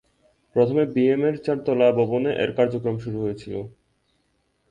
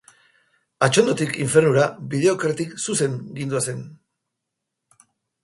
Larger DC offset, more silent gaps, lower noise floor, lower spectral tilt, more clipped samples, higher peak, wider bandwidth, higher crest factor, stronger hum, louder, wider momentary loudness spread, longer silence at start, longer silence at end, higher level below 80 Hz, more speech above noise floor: neither; neither; second, -69 dBFS vs -81 dBFS; first, -8.5 dB/octave vs -4.5 dB/octave; neither; second, -6 dBFS vs -2 dBFS; second, 9 kHz vs 11.5 kHz; about the same, 18 dB vs 20 dB; neither; about the same, -22 LUFS vs -21 LUFS; about the same, 12 LU vs 10 LU; second, 0.55 s vs 0.8 s; second, 1 s vs 1.5 s; about the same, -58 dBFS vs -62 dBFS; second, 47 dB vs 61 dB